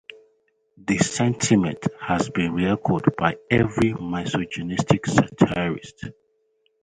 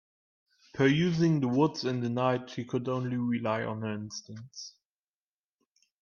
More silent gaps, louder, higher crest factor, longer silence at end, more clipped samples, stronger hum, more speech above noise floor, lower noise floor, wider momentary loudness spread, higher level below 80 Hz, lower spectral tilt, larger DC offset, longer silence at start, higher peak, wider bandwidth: neither; first, -22 LUFS vs -29 LUFS; about the same, 22 dB vs 18 dB; second, 0.7 s vs 1.3 s; neither; neither; second, 46 dB vs over 61 dB; second, -68 dBFS vs under -90 dBFS; second, 9 LU vs 18 LU; first, -48 dBFS vs -68 dBFS; about the same, -5.5 dB/octave vs -6.5 dB/octave; neither; about the same, 0.85 s vs 0.75 s; first, -2 dBFS vs -12 dBFS; first, 10.5 kHz vs 7.2 kHz